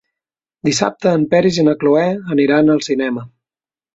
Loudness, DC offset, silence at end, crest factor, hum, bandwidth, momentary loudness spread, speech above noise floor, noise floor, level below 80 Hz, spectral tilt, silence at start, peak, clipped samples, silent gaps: -15 LUFS; under 0.1%; 0.7 s; 14 dB; none; 8 kHz; 7 LU; over 76 dB; under -90 dBFS; -56 dBFS; -5.5 dB/octave; 0.65 s; -2 dBFS; under 0.1%; none